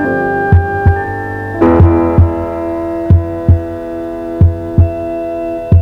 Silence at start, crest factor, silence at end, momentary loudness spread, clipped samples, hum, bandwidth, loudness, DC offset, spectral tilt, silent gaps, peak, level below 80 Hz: 0 s; 12 dB; 0 s; 11 LU; 2%; none; 3.7 kHz; -13 LUFS; under 0.1%; -10.5 dB/octave; none; 0 dBFS; -22 dBFS